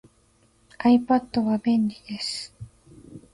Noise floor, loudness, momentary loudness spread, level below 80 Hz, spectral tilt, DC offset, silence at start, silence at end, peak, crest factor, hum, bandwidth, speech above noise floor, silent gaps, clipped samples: -62 dBFS; -24 LUFS; 14 LU; -58 dBFS; -5.5 dB/octave; under 0.1%; 0.8 s; 0.15 s; -10 dBFS; 16 dB; none; 11.5 kHz; 39 dB; none; under 0.1%